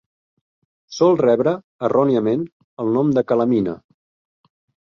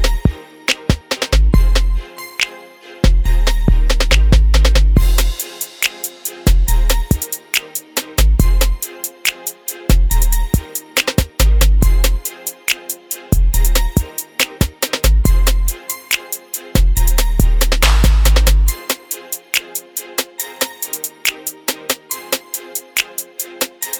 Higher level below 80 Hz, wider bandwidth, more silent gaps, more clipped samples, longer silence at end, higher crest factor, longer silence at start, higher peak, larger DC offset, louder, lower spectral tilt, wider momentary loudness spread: second, -60 dBFS vs -16 dBFS; second, 7 kHz vs over 20 kHz; first, 1.64-1.79 s, 2.52-2.77 s vs none; neither; first, 1.1 s vs 0 s; about the same, 16 dB vs 14 dB; first, 0.9 s vs 0 s; second, -4 dBFS vs 0 dBFS; neither; about the same, -19 LUFS vs -17 LUFS; first, -7.5 dB/octave vs -3.5 dB/octave; about the same, 11 LU vs 11 LU